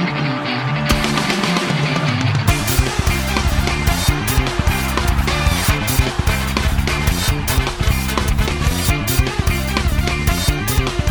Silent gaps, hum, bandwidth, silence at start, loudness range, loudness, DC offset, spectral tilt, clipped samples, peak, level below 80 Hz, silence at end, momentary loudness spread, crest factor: none; none; over 20 kHz; 0 s; 1 LU; -18 LUFS; under 0.1%; -4.5 dB/octave; under 0.1%; -2 dBFS; -22 dBFS; 0 s; 2 LU; 16 dB